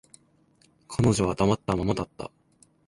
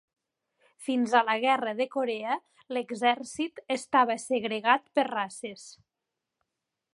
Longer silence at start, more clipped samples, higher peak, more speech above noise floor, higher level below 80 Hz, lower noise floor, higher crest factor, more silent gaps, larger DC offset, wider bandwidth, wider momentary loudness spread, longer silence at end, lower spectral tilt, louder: about the same, 0.9 s vs 0.8 s; neither; second, -10 dBFS vs -6 dBFS; second, 38 dB vs 58 dB; first, -46 dBFS vs -80 dBFS; second, -63 dBFS vs -87 dBFS; about the same, 18 dB vs 22 dB; neither; neither; about the same, 11.5 kHz vs 11.5 kHz; first, 16 LU vs 11 LU; second, 0.6 s vs 1.2 s; first, -6 dB/octave vs -3 dB/octave; about the same, -26 LUFS vs -28 LUFS